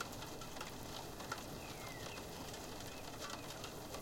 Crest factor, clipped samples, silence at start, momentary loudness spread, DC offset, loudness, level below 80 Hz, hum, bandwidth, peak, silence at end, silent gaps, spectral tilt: 20 dB; under 0.1%; 0 s; 2 LU; under 0.1%; -48 LUFS; -60 dBFS; none; 17 kHz; -28 dBFS; 0 s; none; -3.5 dB/octave